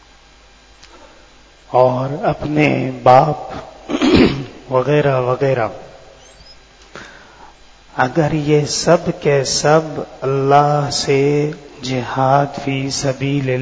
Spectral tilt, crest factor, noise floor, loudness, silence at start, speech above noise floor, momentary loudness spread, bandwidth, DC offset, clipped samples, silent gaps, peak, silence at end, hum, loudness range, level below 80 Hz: -5.5 dB/octave; 16 dB; -46 dBFS; -16 LUFS; 1.7 s; 31 dB; 13 LU; 8 kHz; under 0.1%; under 0.1%; none; 0 dBFS; 0 s; none; 6 LU; -42 dBFS